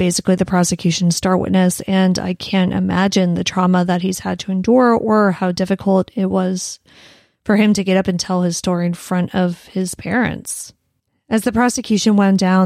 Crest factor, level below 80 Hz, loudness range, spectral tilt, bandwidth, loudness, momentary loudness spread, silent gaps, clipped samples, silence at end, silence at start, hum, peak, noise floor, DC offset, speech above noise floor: 14 dB; -48 dBFS; 4 LU; -5.5 dB/octave; 15 kHz; -17 LUFS; 8 LU; none; under 0.1%; 0 s; 0 s; none; -2 dBFS; -68 dBFS; under 0.1%; 52 dB